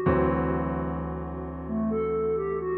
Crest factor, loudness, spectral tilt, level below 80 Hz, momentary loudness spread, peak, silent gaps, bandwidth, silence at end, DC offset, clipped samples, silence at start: 16 dB; -28 LUFS; -12 dB/octave; -40 dBFS; 10 LU; -12 dBFS; none; 4.1 kHz; 0 s; under 0.1%; under 0.1%; 0 s